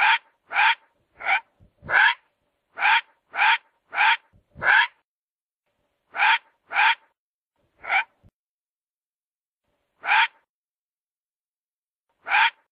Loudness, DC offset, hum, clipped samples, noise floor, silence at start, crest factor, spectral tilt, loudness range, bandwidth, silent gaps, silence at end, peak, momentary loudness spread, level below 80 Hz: -21 LUFS; under 0.1%; none; under 0.1%; under -90 dBFS; 0 s; 20 dB; -3.5 dB/octave; 7 LU; 5.2 kHz; 5.05-5.60 s, 7.18-7.47 s, 8.33-9.60 s, 10.49-12.05 s; 0.2 s; -4 dBFS; 13 LU; -68 dBFS